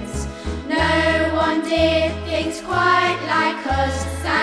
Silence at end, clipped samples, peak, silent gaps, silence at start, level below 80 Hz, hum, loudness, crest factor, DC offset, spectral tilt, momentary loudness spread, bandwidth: 0 s; under 0.1%; -4 dBFS; none; 0 s; -34 dBFS; none; -19 LUFS; 16 dB; under 0.1%; -5 dB/octave; 8 LU; 11 kHz